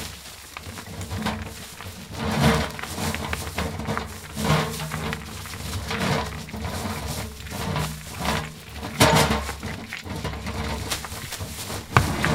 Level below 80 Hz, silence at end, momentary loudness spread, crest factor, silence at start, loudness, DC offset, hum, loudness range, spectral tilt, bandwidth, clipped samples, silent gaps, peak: -40 dBFS; 0 s; 15 LU; 26 dB; 0 s; -27 LUFS; under 0.1%; none; 4 LU; -4.5 dB/octave; 17.5 kHz; under 0.1%; none; 0 dBFS